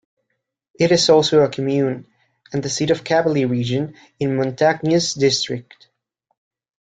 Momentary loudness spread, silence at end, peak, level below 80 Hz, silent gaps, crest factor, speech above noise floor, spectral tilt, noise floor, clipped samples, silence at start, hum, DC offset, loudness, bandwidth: 12 LU; 1.2 s; -2 dBFS; -58 dBFS; none; 18 dB; 57 dB; -4.5 dB/octave; -75 dBFS; under 0.1%; 0.8 s; none; under 0.1%; -18 LUFS; 9.4 kHz